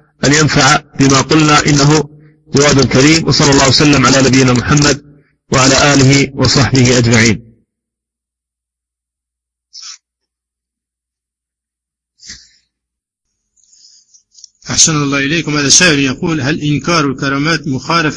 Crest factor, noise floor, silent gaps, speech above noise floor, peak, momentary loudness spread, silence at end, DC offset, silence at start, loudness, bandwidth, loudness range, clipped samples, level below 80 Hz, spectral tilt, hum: 12 dB; -83 dBFS; none; 73 dB; 0 dBFS; 8 LU; 0 s; under 0.1%; 0.2 s; -9 LUFS; 11 kHz; 7 LU; 0.1%; -36 dBFS; -4 dB/octave; none